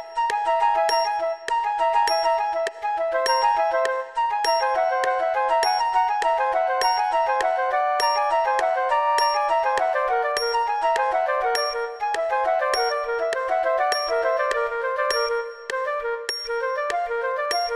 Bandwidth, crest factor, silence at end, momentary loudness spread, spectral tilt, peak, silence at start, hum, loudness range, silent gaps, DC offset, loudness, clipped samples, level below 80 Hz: 13 kHz; 18 dB; 0 s; 6 LU; 0 dB/octave; -4 dBFS; 0 s; none; 2 LU; none; under 0.1%; -22 LUFS; under 0.1%; -58 dBFS